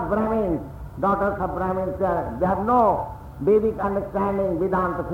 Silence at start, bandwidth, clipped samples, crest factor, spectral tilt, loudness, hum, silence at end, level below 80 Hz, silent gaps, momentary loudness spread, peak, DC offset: 0 s; 16 kHz; under 0.1%; 14 dB; -9.5 dB/octave; -23 LUFS; none; 0 s; -40 dBFS; none; 7 LU; -8 dBFS; under 0.1%